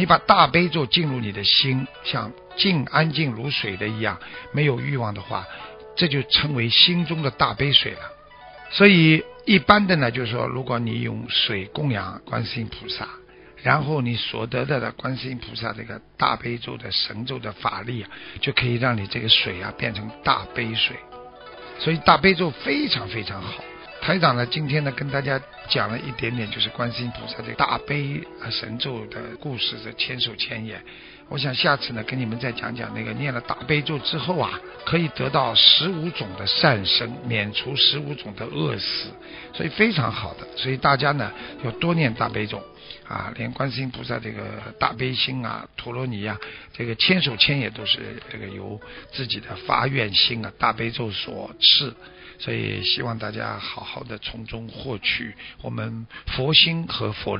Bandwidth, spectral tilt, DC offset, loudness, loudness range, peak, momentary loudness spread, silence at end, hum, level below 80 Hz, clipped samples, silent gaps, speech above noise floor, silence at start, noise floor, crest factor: 5.6 kHz; -2.5 dB/octave; under 0.1%; -22 LUFS; 8 LU; 0 dBFS; 16 LU; 0 s; none; -50 dBFS; under 0.1%; none; 21 dB; 0 s; -44 dBFS; 24 dB